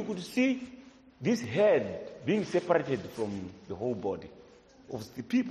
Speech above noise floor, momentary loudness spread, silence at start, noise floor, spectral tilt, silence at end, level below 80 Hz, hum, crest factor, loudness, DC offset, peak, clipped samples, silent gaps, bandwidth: 25 dB; 16 LU; 0 s; -56 dBFS; -6 dB/octave; 0 s; -66 dBFS; none; 20 dB; -31 LUFS; under 0.1%; -12 dBFS; under 0.1%; none; 13 kHz